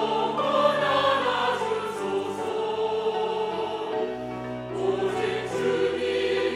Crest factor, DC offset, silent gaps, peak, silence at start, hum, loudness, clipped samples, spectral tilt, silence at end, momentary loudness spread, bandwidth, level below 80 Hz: 18 dB; under 0.1%; none; -8 dBFS; 0 s; none; -26 LUFS; under 0.1%; -4.5 dB/octave; 0 s; 7 LU; 13.5 kHz; -62 dBFS